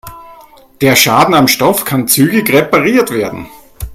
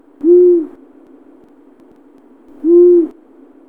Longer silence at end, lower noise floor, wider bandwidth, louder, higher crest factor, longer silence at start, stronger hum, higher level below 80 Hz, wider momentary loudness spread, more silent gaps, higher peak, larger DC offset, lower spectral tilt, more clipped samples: second, 0 s vs 0.6 s; second, -39 dBFS vs -45 dBFS; first, over 20 kHz vs 1.5 kHz; about the same, -10 LUFS vs -10 LUFS; about the same, 12 dB vs 12 dB; second, 0.05 s vs 0.25 s; neither; first, -38 dBFS vs -62 dBFS; second, 11 LU vs 14 LU; neither; about the same, 0 dBFS vs -2 dBFS; second, under 0.1% vs 0.3%; second, -4 dB/octave vs -10.5 dB/octave; first, 0.2% vs under 0.1%